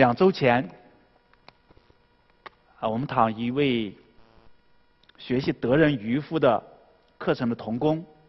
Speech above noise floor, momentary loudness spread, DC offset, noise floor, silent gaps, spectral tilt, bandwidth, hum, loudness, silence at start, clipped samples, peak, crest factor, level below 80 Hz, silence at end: 39 dB; 10 LU; under 0.1%; -62 dBFS; none; -8.5 dB/octave; 6 kHz; none; -25 LUFS; 0 s; under 0.1%; -4 dBFS; 22 dB; -58 dBFS; 0.25 s